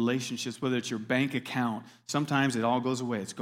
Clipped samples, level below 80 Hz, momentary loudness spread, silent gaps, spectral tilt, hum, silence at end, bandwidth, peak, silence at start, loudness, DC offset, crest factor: under 0.1%; -76 dBFS; 7 LU; none; -5 dB/octave; none; 0 s; 16 kHz; -12 dBFS; 0 s; -30 LUFS; under 0.1%; 18 dB